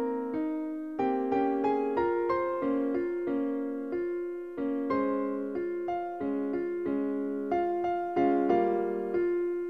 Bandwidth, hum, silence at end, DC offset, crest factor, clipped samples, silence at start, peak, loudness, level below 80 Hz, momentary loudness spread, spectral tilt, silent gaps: 5.8 kHz; none; 0 s; 0.1%; 16 dB; under 0.1%; 0 s; -12 dBFS; -30 LUFS; -66 dBFS; 6 LU; -8.5 dB/octave; none